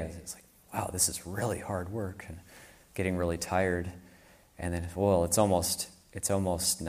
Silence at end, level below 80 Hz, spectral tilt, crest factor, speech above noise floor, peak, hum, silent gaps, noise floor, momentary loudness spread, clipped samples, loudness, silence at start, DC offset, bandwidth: 0 s; -52 dBFS; -4 dB/octave; 22 dB; 27 dB; -10 dBFS; none; none; -58 dBFS; 17 LU; under 0.1%; -31 LUFS; 0 s; under 0.1%; 15.5 kHz